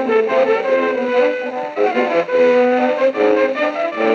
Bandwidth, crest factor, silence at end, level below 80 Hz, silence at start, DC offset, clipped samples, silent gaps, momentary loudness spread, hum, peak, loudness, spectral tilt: 7 kHz; 12 dB; 0 s; -86 dBFS; 0 s; under 0.1%; under 0.1%; none; 5 LU; none; -4 dBFS; -16 LUFS; -5 dB/octave